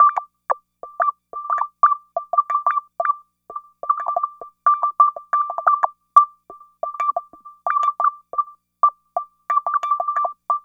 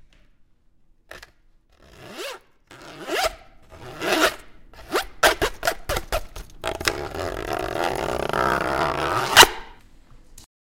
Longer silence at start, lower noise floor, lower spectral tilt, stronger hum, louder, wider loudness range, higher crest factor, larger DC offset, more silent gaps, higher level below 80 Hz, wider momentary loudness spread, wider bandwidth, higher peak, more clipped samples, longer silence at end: second, 0 s vs 1.1 s; second, -46 dBFS vs -56 dBFS; about the same, -2 dB/octave vs -2 dB/octave; neither; about the same, -21 LUFS vs -21 LUFS; second, 3 LU vs 13 LU; about the same, 22 dB vs 24 dB; neither; neither; second, -72 dBFS vs -42 dBFS; second, 13 LU vs 25 LU; second, 7.2 kHz vs 17 kHz; about the same, 0 dBFS vs 0 dBFS; neither; second, 0.05 s vs 0.3 s